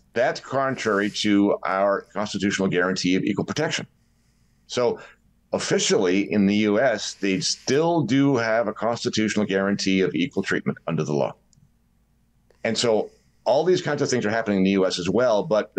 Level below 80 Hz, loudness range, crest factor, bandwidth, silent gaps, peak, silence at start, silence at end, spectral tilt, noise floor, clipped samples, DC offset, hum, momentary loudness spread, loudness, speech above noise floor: -64 dBFS; 4 LU; 12 dB; 10 kHz; none; -10 dBFS; 0.15 s; 0.15 s; -4.5 dB/octave; -63 dBFS; under 0.1%; under 0.1%; none; 6 LU; -23 LUFS; 41 dB